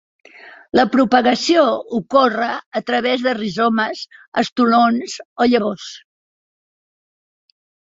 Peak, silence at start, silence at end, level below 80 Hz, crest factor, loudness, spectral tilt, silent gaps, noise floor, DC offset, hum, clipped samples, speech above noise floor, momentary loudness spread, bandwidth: -2 dBFS; 0.45 s; 2 s; -60 dBFS; 16 dB; -17 LUFS; -4.5 dB/octave; 2.66-2.71 s, 4.28-4.32 s, 4.52-4.56 s, 5.25-5.36 s; under -90 dBFS; under 0.1%; none; under 0.1%; over 73 dB; 10 LU; 7.8 kHz